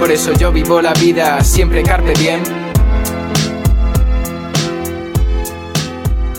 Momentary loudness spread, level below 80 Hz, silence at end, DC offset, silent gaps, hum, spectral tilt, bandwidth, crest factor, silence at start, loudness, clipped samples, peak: 8 LU; -16 dBFS; 0 s; under 0.1%; none; none; -5 dB/octave; 17 kHz; 12 dB; 0 s; -14 LUFS; under 0.1%; 0 dBFS